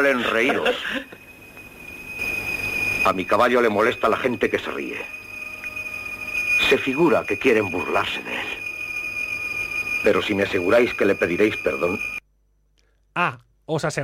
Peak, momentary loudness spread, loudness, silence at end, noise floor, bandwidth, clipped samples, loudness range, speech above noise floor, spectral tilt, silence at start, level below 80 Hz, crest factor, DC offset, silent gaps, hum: -4 dBFS; 14 LU; -22 LUFS; 0 s; -63 dBFS; 16 kHz; under 0.1%; 2 LU; 42 dB; -4.5 dB/octave; 0 s; -52 dBFS; 18 dB; under 0.1%; none; none